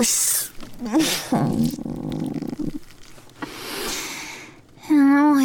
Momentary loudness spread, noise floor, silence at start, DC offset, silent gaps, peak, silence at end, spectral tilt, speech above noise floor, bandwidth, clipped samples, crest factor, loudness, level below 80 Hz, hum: 18 LU; -43 dBFS; 0 s; under 0.1%; none; -10 dBFS; 0 s; -3.5 dB/octave; 22 dB; 19 kHz; under 0.1%; 14 dB; -22 LUFS; -46 dBFS; none